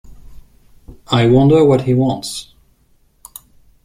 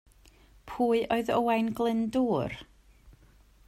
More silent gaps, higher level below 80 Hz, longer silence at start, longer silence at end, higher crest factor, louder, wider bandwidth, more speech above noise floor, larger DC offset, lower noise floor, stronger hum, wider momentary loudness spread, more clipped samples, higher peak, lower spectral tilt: neither; first, -42 dBFS vs -58 dBFS; second, 0.05 s vs 0.65 s; first, 1.45 s vs 0.55 s; about the same, 16 dB vs 16 dB; first, -13 LUFS vs -28 LUFS; about the same, 15.5 kHz vs 16 kHz; first, 43 dB vs 31 dB; neither; second, -55 dBFS vs -59 dBFS; neither; first, 26 LU vs 10 LU; neither; first, -2 dBFS vs -14 dBFS; about the same, -7 dB/octave vs -6.5 dB/octave